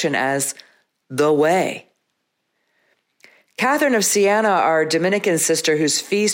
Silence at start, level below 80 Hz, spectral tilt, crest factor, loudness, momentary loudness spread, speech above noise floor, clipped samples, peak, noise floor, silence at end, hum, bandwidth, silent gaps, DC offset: 0 s; -72 dBFS; -3 dB/octave; 14 dB; -18 LUFS; 10 LU; 55 dB; under 0.1%; -6 dBFS; -73 dBFS; 0 s; none; 16.5 kHz; none; under 0.1%